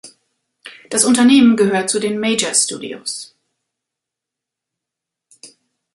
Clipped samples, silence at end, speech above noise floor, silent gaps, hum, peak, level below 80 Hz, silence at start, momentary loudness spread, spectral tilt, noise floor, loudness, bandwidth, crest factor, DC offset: under 0.1%; 0.45 s; 69 dB; none; none; 0 dBFS; -62 dBFS; 0.05 s; 15 LU; -3 dB/octave; -84 dBFS; -15 LUFS; 11.5 kHz; 18 dB; under 0.1%